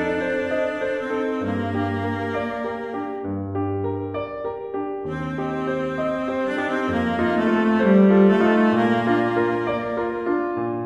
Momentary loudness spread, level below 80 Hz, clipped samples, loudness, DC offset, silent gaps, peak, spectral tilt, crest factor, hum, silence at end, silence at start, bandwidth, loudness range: 12 LU; -54 dBFS; under 0.1%; -22 LUFS; under 0.1%; none; -6 dBFS; -8 dB/octave; 16 dB; none; 0 s; 0 s; 8.4 kHz; 9 LU